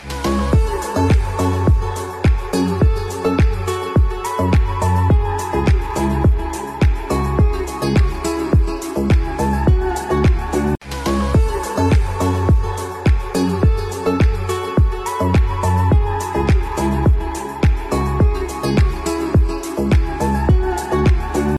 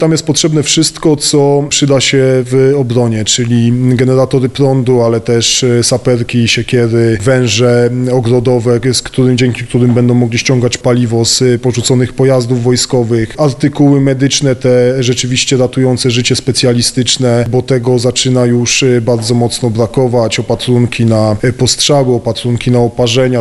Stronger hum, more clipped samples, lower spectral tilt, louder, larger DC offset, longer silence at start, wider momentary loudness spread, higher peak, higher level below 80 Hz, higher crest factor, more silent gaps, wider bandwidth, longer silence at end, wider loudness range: neither; neither; first, -7 dB/octave vs -5 dB/octave; second, -18 LUFS vs -10 LUFS; second, under 0.1% vs 0.3%; about the same, 0 s vs 0 s; about the same, 4 LU vs 3 LU; second, -6 dBFS vs 0 dBFS; first, -20 dBFS vs -38 dBFS; about the same, 10 dB vs 10 dB; neither; first, 13.5 kHz vs 12 kHz; about the same, 0 s vs 0 s; about the same, 1 LU vs 1 LU